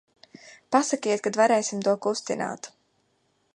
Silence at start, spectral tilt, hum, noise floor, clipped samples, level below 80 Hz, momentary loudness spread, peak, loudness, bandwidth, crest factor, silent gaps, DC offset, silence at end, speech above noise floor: 0.45 s; -3.5 dB/octave; none; -70 dBFS; under 0.1%; -78 dBFS; 11 LU; -6 dBFS; -25 LUFS; 11.5 kHz; 22 dB; none; under 0.1%; 0.85 s; 45 dB